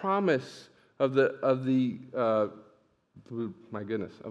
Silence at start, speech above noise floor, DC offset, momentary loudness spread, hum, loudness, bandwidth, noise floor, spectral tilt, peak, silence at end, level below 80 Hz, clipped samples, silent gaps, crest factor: 0 s; 35 dB; under 0.1%; 14 LU; none; -29 LUFS; 9.4 kHz; -64 dBFS; -7.5 dB/octave; -12 dBFS; 0 s; -80 dBFS; under 0.1%; none; 18 dB